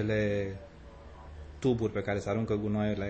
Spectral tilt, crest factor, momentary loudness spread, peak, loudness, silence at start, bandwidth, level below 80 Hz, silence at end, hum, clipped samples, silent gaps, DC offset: -7.5 dB/octave; 14 dB; 21 LU; -18 dBFS; -32 LUFS; 0 s; 8.6 kHz; -50 dBFS; 0 s; none; under 0.1%; none; under 0.1%